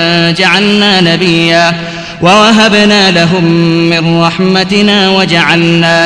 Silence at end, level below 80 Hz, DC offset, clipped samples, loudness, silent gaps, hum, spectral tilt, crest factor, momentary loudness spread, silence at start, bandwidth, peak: 0 s; -40 dBFS; 0.4%; 3%; -6 LUFS; none; none; -5 dB/octave; 8 dB; 4 LU; 0 s; 11 kHz; 0 dBFS